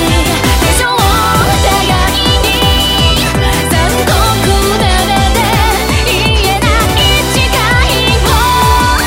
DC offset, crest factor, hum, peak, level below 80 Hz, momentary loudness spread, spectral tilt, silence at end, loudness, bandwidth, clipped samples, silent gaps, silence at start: under 0.1%; 10 dB; none; 0 dBFS; -16 dBFS; 2 LU; -3.5 dB/octave; 0 s; -9 LUFS; 16.5 kHz; under 0.1%; none; 0 s